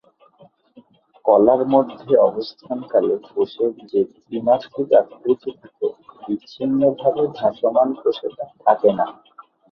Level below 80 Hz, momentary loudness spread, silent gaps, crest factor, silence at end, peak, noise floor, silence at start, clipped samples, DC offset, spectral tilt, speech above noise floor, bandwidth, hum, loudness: -62 dBFS; 12 LU; none; 18 dB; 0.6 s; -2 dBFS; -53 dBFS; 1.25 s; under 0.1%; under 0.1%; -8.5 dB/octave; 34 dB; 6 kHz; none; -20 LUFS